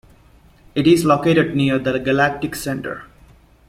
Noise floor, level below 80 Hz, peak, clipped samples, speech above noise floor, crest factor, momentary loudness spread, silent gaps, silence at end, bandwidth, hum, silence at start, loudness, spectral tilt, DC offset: -50 dBFS; -48 dBFS; -2 dBFS; under 0.1%; 33 dB; 16 dB; 12 LU; none; 0.65 s; 16.5 kHz; none; 0.75 s; -18 LUFS; -6 dB/octave; under 0.1%